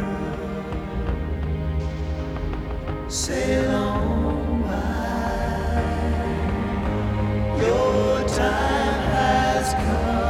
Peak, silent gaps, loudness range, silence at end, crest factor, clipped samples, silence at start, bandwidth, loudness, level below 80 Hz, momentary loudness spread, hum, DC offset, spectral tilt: -8 dBFS; none; 5 LU; 0 s; 14 dB; under 0.1%; 0 s; 14.5 kHz; -24 LUFS; -28 dBFS; 9 LU; none; under 0.1%; -5.5 dB/octave